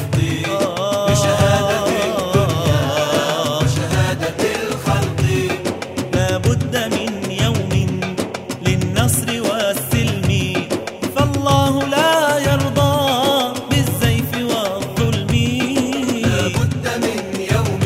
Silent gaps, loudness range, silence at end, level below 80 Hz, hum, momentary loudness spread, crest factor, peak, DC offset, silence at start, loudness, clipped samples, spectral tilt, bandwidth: none; 3 LU; 0 s; -38 dBFS; none; 6 LU; 16 dB; 0 dBFS; under 0.1%; 0 s; -18 LUFS; under 0.1%; -5 dB/octave; 16 kHz